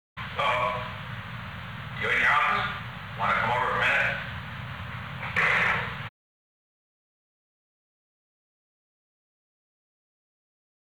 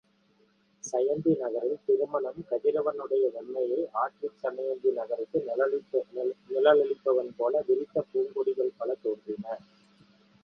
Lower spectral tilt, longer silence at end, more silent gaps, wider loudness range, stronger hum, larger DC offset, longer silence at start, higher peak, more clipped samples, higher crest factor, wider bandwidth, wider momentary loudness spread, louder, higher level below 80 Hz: second, -4.5 dB/octave vs -6 dB/octave; first, 4.8 s vs 0.85 s; neither; about the same, 4 LU vs 3 LU; neither; first, 0.2% vs under 0.1%; second, 0.15 s vs 0.85 s; second, -12 dBFS vs -8 dBFS; neither; about the same, 18 dB vs 20 dB; first, over 20 kHz vs 7 kHz; first, 16 LU vs 8 LU; first, -26 LUFS vs -29 LUFS; first, -54 dBFS vs -76 dBFS